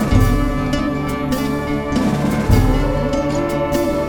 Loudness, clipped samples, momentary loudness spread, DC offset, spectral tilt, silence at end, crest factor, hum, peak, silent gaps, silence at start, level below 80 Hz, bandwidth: -18 LUFS; under 0.1%; 5 LU; under 0.1%; -6.5 dB/octave; 0 s; 16 dB; none; -2 dBFS; none; 0 s; -24 dBFS; over 20 kHz